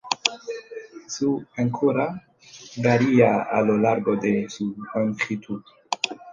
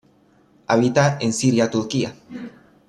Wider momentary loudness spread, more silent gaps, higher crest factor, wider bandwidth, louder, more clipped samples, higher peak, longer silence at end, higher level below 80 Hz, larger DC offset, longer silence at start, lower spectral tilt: about the same, 17 LU vs 19 LU; neither; about the same, 22 dB vs 18 dB; second, 9.6 kHz vs 12 kHz; second, -23 LUFS vs -20 LUFS; neither; about the same, -2 dBFS vs -4 dBFS; second, 0 s vs 0.4 s; about the same, -64 dBFS vs -60 dBFS; neither; second, 0.05 s vs 0.7 s; about the same, -5 dB/octave vs -5.5 dB/octave